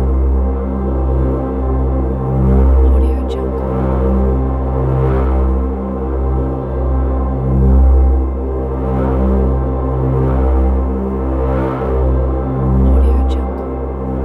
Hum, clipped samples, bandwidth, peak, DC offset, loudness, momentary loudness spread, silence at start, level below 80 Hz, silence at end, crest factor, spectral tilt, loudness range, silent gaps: none; under 0.1%; 4 kHz; -2 dBFS; under 0.1%; -16 LUFS; 7 LU; 0 s; -14 dBFS; 0 s; 12 dB; -11 dB/octave; 2 LU; none